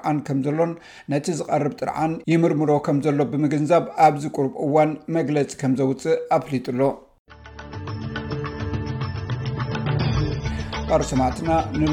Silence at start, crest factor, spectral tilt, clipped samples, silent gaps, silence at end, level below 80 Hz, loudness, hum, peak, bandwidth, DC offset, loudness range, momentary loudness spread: 0 s; 18 dB; -7 dB/octave; under 0.1%; 7.19-7.25 s; 0 s; -40 dBFS; -22 LUFS; none; -4 dBFS; 13 kHz; under 0.1%; 7 LU; 10 LU